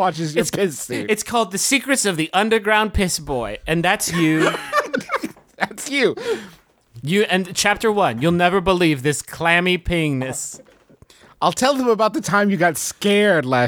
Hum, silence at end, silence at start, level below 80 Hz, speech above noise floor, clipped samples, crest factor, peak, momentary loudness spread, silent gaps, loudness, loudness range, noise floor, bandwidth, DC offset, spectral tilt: none; 0 s; 0 s; -40 dBFS; 31 dB; under 0.1%; 18 dB; -2 dBFS; 9 LU; none; -19 LUFS; 3 LU; -50 dBFS; over 20 kHz; under 0.1%; -4 dB/octave